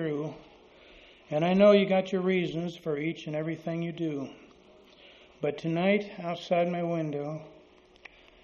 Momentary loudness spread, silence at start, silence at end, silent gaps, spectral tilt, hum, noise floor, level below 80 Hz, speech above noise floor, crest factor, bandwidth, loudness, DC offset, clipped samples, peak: 15 LU; 0 s; 0.95 s; none; -5.5 dB/octave; none; -57 dBFS; -68 dBFS; 29 dB; 20 dB; 7.2 kHz; -29 LUFS; under 0.1%; under 0.1%; -8 dBFS